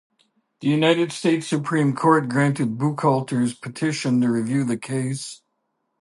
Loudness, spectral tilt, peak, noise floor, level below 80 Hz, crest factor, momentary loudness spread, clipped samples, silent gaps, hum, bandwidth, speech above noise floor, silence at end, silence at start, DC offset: -22 LUFS; -6 dB/octave; -4 dBFS; -74 dBFS; -68 dBFS; 18 dB; 8 LU; under 0.1%; none; none; 11.5 kHz; 53 dB; 0.65 s; 0.6 s; under 0.1%